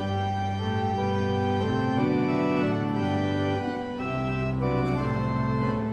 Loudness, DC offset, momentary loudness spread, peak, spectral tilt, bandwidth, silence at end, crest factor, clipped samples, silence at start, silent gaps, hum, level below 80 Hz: -27 LUFS; under 0.1%; 4 LU; -12 dBFS; -8 dB/octave; 9 kHz; 0 s; 14 dB; under 0.1%; 0 s; none; none; -46 dBFS